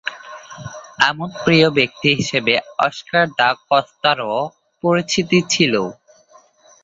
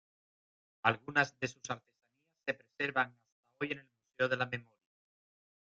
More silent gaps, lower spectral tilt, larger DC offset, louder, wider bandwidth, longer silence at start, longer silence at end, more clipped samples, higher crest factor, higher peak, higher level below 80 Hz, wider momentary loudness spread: second, none vs 3.32-3.43 s; about the same, -4 dB/octave vs -4.5 dB/octave; neither; first, -17 LUFS vs -36 LUFS; about the same, 7.8 kHz vs 7.8 kHz; second, 0.05 s vs 0.85 s; second, 0.9 s vs 1.2 s; neither; second, 18 dB vs 26 dB; first, 0 dBFS vs -12 dBFS; first, -56 dBFS vs -78 dBFS; first, 15 LU vs 11 LU